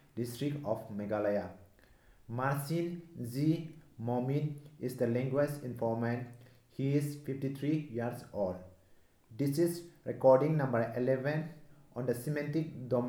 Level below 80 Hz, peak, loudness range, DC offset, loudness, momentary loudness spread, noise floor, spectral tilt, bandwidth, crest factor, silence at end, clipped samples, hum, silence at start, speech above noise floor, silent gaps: -70 dBFS; -12 dBFS; 5 LU; under 0.1%; -34 LUFS; 11 LU; -63 dBFS; -7.5 dB/octave; 18.5 kHz; 22 dB; 0 s; under 0.1%; none; 0.15 s; 30 dB; none